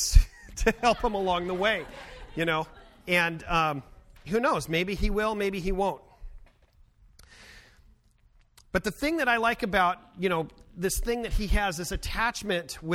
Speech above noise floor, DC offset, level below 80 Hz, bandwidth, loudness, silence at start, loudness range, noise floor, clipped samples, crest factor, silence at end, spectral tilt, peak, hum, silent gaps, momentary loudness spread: 34 dB; under 0.1%; -34 dBFS; 16 kHz; -28 LUFS; 0 s; 7 LU; -61 dBFS; under 0.1%; 24 dB; 0 s; -4 dB/octave; -4 dBFS; none; none; 8 LU